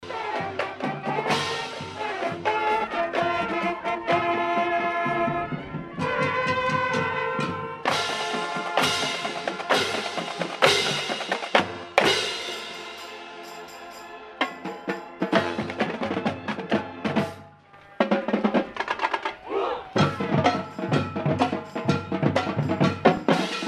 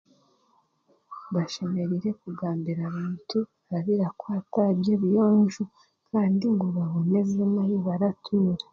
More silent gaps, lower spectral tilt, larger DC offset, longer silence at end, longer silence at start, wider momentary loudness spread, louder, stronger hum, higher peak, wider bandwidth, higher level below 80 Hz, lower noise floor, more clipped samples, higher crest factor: neither; second, -4.5 dB/octave vs -8.5 dB/octave; neither; about the same, 0 s vs 0.1 s; second, 0 s vs 1.1 s; about the same, 11 LU vs 10 LU; about the same, -25 LUFS vs -26 LUFS; neither; first, 0 dBFS vs -12 dBFS; first, 14.5 kHz vs 7.2 kHz; first, -60 dBFS vs -66 dBFS; second, -50 dBFS vs -67 dBFS; neither; first, 26 dB vs 14 dB